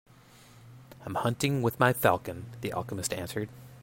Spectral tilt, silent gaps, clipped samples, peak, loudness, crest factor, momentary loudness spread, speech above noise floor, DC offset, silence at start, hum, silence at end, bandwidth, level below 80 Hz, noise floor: -5 dB/octave; none; under 0.1%; -8 dBFS; -30 LUFS; 22 dB; 14 LU; 26 dB; under 0.1%; 0.55 s; none; 0 s; 16.5 kHz; -60 dBFS; -55 dBFS